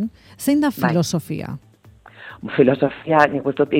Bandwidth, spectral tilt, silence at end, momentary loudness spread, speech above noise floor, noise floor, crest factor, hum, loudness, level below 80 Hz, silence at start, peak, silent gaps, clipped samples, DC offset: 17 kHz; -6 dB/octave; 0 s; 18 LU; 29 dB; -48 dBFS; 20 dB; none; -19 LUFS; -56 dBFS; 0 s; 0 dBFS; none; under 0.1%; under 0.1%